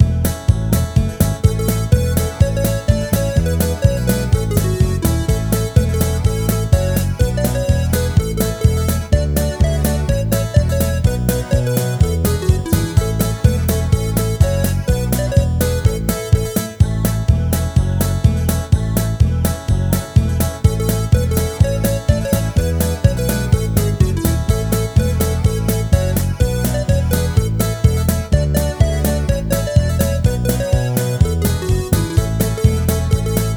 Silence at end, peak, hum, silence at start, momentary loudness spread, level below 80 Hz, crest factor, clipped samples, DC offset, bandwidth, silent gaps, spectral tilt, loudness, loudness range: 0 s; 0 dBFS; none; 0 s; 2 LU; -22 dBFS; 16 dB; under 0.1%; under 0.1%; over 20 kHz; none; -6 dB/octave; -17 LUFS; 0 LU